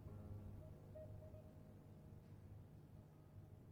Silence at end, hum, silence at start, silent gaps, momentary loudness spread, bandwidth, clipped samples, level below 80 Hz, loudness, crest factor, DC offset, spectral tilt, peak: 0 s; none; 0 s; none; 7 LU; 17 kHz; under 0.1%; -68 dBFS; -60 LUFS; 14 dB; under 0.1%; -8.5 dB/octave; -44 dBFS